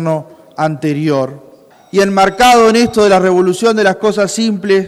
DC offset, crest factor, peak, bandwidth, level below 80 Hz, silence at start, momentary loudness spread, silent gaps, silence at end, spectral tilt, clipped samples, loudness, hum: under 0.1%; 12 dB; 0 dBFS; 14 kHz; -44 dBFS; 0 s; 10 LU; none; 0 s; -5 dB/octave; under 0.1%; -11 LUFS; none